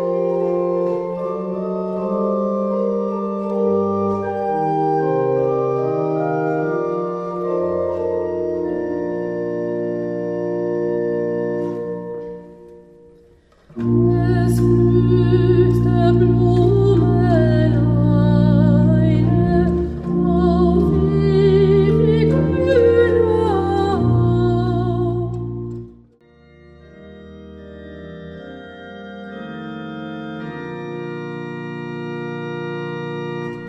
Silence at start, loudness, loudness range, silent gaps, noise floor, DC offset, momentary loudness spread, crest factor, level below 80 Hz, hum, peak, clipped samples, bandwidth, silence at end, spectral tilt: 0 s; -18 LUFS; 16 LU; none; -51 dBFS; under 0.1%; 16 LU; 14 dB; -34 dBFS; none; -2 dBFS; under 0.1%; 11 kHz; 0 s; -9.5 dB/octave